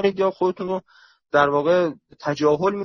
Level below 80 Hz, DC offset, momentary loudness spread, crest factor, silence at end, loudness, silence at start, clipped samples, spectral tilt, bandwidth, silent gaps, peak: -60 dBFS; under 0.1%; 10 LU; 16 dB; 0 s; -21 LUFS; 0 s; under 0.1%; -6.5 dB/octave; 6.8 kHz; none; -4 dBFS